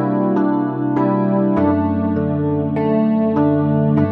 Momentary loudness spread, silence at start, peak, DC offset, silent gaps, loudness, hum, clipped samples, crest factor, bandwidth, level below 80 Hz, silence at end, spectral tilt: 3 LU; 0 s; -4 dBFS; under 0.1%; none; -17 LUFS; none; under 0.1%; 12 dB; 4.4 kHz; -52 dBFS; 0 s; -11.5 dB/octave